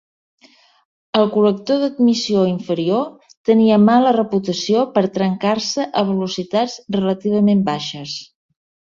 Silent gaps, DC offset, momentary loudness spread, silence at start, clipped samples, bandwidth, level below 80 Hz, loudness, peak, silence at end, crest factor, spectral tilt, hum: 3.37-3.44 s; under 0.1%; 9 LU; 1.15 s; under 0.1%; 7.6 kHz; -60 dBFS; -17 LUFS; -2 dBFS; 0.75 s; 16 dB; -6 dB/octave; none